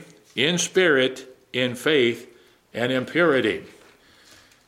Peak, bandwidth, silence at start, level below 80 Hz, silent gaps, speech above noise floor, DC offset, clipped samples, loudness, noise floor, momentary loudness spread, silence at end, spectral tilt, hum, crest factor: -4 dBFS; 15.5 kHz; 0 s; -68 dBFS; none; 32 dB; under 0.1%; under 0.1%; -22 LUFS; -53 dBFS; 14 LU; 1 s; -3.5 dB/octave; none; 20 dB